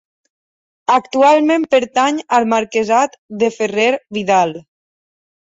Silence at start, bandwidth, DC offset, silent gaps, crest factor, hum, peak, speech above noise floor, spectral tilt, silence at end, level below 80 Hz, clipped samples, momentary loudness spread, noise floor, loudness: 0.9 s; 7.8 kHz; under 0.1%; 3.18-3.29 s; 14 dB; none; -2 dBFS; over 75 dB; -4 dB/octave; 0.8 s; -62 dBFS; under 0.1%; 9 LU; under -90 dBFS; -15 LUFS